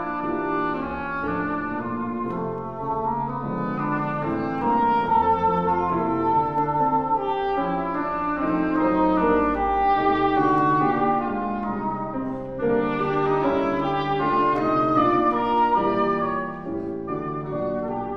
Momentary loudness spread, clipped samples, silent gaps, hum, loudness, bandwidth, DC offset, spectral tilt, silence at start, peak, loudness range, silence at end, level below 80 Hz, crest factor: 8 LU; under 0.1%; none; none; -23 LUFS; 6.4 kHz; 0.5%; -8.5 dB/octave; 0 s; -8 dBFS; 6 LU; 0 s; -46 dBFS; 16 dB